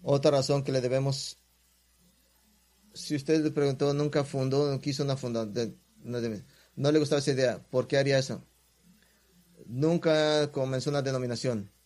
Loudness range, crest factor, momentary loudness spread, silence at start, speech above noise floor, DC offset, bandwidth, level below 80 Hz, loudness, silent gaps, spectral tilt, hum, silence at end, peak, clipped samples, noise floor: 2 LU; 18 dB; 12 LU; 0 s; 38 dB; under 0.1%; 13 kHz; -66 dBFS; -29 LUFS; none; -5.5 dB/octave; none; 0.2 s; -10 dBFS; under 0.1%; -66 dBFS